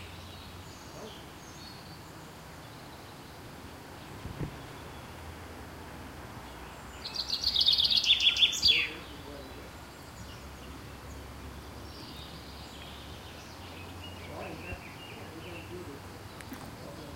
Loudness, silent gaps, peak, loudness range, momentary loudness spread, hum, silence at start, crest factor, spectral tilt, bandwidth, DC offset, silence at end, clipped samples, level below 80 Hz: -26 LUFS; none; -10 dBFS; 20 LU; 24 LU; none; 0 s; 24 dB; -2 dB/octave; 16 kHz; under 0.1%; 0 s; under 0.1%; -54 dBFS